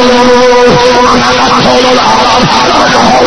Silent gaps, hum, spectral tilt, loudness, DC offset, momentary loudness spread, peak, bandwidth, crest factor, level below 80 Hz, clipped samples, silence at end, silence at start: none; none; -3.5 dB/octave; -5 LUFS; under 0.1%; 1 LU; 0 dBFS; 11 kHz; 6 dB; -28 dBFS; 5%; 0 s; 0 s